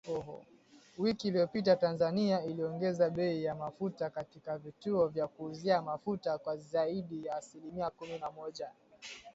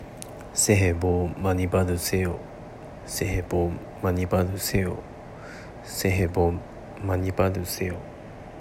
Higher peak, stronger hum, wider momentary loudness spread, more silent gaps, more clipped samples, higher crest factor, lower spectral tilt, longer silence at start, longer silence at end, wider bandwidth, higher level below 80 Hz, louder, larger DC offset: second, -16 dBFS vs -6 dBFS; neither; second, 14 LU vs 18 LU; neither; neither; about the same, 20 dB vs 20 dB; first, -6.5 dB/octave vs -5 dB/octave; about the same, 0.05 s vs 0 s; about the same, 0.05 s vs 0 s; second, 8 kHz vs 16 kHz; second, -72 dBFS vs -44 dBFS; second, -35 LUFS vs -26 LUFS; neither